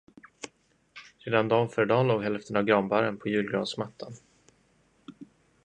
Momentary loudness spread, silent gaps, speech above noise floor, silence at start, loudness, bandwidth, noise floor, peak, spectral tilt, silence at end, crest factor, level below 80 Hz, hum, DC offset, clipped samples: 21 LU; none; 39 dB; 0.45 s; -27 LUFS; 9.8 kHz; -66 dBFS; -8 dBFS; -6.5 dB/octave; 0.4 s; 22 dB; -68 dBFS; none; under 0.1%; under 0.1%